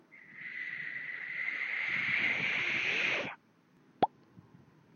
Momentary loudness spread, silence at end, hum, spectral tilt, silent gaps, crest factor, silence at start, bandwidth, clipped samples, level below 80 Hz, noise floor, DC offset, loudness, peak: 13 LU; 0.55 s; none; -3 dB/octave; none; 24 dB; 0.1 s; 7 kHz; under 0.1%; -78 dBFS; -66 dBFS; under 0.1%; -33 LUFS; -12 dBFS